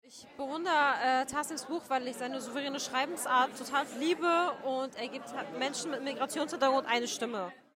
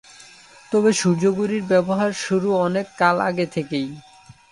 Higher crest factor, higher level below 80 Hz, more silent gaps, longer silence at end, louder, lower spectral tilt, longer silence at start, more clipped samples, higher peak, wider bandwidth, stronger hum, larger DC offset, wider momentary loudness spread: about the same, 16 dB vs 18 dB; second, -76 dBFS vs -62 dBFS; neither; about the same, 0.2 s vs 0.2 s; second, -32 LUFS vs -20 LUFS; second, -2 dB/octave vs -5.5 dB/octave; second, 0.05 s vs 0.2 s; neither; second, -16 dBFS vs -2 dBFS; first, 16 kHz vs 11.5 kHz; neither; neither; first, 11 LU vs 7 LU